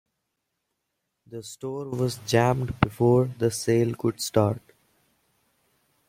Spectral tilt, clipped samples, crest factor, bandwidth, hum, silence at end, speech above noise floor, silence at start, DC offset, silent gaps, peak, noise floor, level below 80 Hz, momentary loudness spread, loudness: -6 dB/octave; under 0.1%; 24 dB; 16.5 kHz; none; 1.5 s; 56 dB; 1.3 s; under 0.1%; none; -2 dBFS; -80 dBFS; -54 dBFS; 15 LU; -25 LUFS